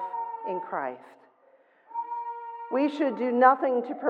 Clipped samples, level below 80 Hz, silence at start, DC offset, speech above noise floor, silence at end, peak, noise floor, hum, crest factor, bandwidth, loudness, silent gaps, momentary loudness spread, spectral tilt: under 0.1%; under -90 dBFS; 0 s; under 0.1%; 36 dB; 0 s; -6 dBFS; -61 dBFS; none; 22 dB; 7.4 kHz; -27 LUFS; none; 17 LU; -6.5 dB/octave